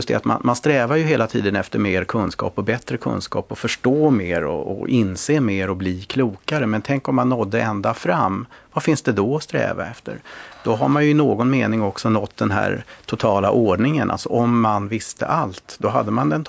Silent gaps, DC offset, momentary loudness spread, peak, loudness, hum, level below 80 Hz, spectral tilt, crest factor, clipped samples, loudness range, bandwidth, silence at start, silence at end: none; under 0.1%; 8 LU; -2 dBFS; -20 LUFS; none; -46 dBFS; -6.5 dB/octave; 16 dB; under 0.1%; 2 LU; 8 kHz; 0 s; 0 s